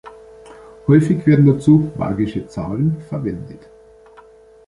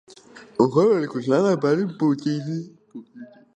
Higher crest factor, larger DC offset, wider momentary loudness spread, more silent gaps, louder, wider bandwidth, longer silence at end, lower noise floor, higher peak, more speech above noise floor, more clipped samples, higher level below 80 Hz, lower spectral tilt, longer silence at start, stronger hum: about the same, 16 dB vs 20 dB; neither; second, 14 LU vs 17 LU; neither; first, -17 LUFS vs -21 LUFS; first, 11 kHz vs 9.2 kHz; first, 1.1 s vs 0.3 s; about the same, -45 dBFS vs -47 dBFS; about the same, -2 dBFS vs -4 dBFS; first, 30 dB vs 26 dB; neither; first, -46 dBFS vs -66 dBFS; first, -9.5 dB/octave vs -7.5 dB/octave; second, 0.05 s vs 0.35 s; neither